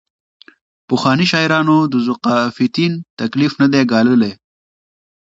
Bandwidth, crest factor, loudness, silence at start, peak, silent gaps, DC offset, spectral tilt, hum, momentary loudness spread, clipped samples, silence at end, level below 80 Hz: 7.8 kHz; 16 dB; -15 LUFS; 0.9 s; 0 dBFS; 3.10-3.17 s; under 0.1%; -6 dB/octave; none; 7 LU; under 0.1%; 0.85 s; -58 dBFS